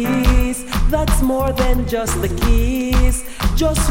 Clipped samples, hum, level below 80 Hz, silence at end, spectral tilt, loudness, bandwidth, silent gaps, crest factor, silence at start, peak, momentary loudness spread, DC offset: under 0.1%; none; -18 dBFS; 0 s; -5 dB/octave; -18 LUFS; 17 kHz; none; 14 dB; 0 s; -2 dBFS; 4 LU; under 0.1%